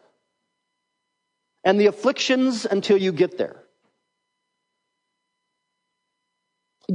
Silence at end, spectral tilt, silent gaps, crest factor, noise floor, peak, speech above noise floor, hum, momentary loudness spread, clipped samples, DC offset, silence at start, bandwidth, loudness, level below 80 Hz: 0 s; -5 dB/octave; none; 20 dB; -78 dBFS; -6 dBFS; 58 dB; none; 10 LU; under 0.1%; under 0.1%; 1.65 s; 10.5 kHz; -21 LUFS; -80 dBFS